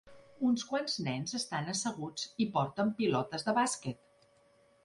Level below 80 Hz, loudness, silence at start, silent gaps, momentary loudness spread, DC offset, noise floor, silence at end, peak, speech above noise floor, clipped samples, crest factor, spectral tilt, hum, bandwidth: -72 dBFS; -34 LUFS; 0.05 s; none; 8 LU; under 0.1%; -66 dBFS; 0.9 s; -16 dBFS; 33 dB; under 0.1%; 18 dB; -4 dB/octave; none; 11.5 kHz